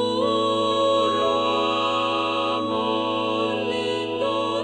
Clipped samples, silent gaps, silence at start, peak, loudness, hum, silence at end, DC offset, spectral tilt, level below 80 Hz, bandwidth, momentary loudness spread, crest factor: under 0.1%; none; 0 s; -10 dBFS; -22 LUFS; none; 0 s; under 0.1%; -4.5 dB/octave; -62 dBFS; 11 kHz; 4 LU; 12 dB